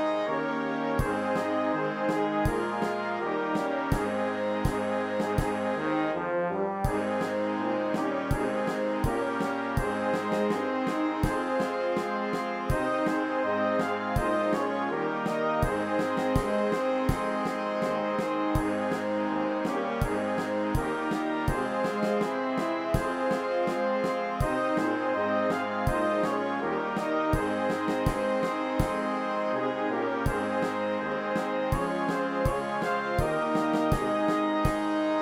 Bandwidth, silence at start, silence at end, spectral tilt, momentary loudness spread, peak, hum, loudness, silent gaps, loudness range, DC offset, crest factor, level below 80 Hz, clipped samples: 16 kHz; 0 s; 0 s; -6.5 dB/octave; 3 LU; -10 dBFS; none; -29 LUFS; none; 1 LU; under 0.1%; 18 dB; -42 dBFS; under 0.1%